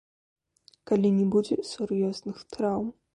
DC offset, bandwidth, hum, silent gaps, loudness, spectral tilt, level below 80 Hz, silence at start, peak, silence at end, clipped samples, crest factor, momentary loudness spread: under 0.1%; 11 kHz; none; none; -27 LUFS; -7.5 dB/octave; -64 dBFS; 0.9 s; -12 dBFS; 0.25 s; under 0.1%; 16 dB; 9 LU